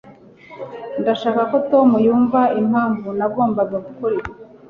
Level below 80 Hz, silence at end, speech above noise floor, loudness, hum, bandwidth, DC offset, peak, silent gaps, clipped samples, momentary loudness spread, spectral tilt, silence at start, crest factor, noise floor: -54 dBFS; 0.25 s; 26 dB; -18 LUFS; none; 6.4 kHz; under 0.1%; -2 dBFS; none; under 0.1%; 15 LU; -8.5 dB/octave; 0.05 s; 16 dB; -43 dBFS